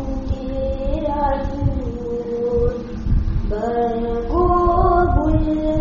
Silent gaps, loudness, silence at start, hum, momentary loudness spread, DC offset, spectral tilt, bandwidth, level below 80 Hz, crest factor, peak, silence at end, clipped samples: none; -20 LUFS; 0 s; none; 10 LU; under 0.1%; -8.5 dB/octave; 7.2 kHz; -24 dBFS; 16 dB; -2 dBFS; 0 s; under 0.1%